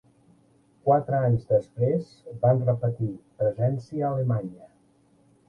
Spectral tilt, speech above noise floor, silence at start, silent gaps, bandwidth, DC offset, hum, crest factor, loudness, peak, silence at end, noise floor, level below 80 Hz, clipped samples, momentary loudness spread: -10.5 dB/octave; 37 dB; 0.85 s; none; 5.4 kHz; under 0.1%; none; 18 dB; -26 LUFS; -8 dBFS; 0.85 s; -62 dBFS; -58 dBFS; under 0.1%; 8 LU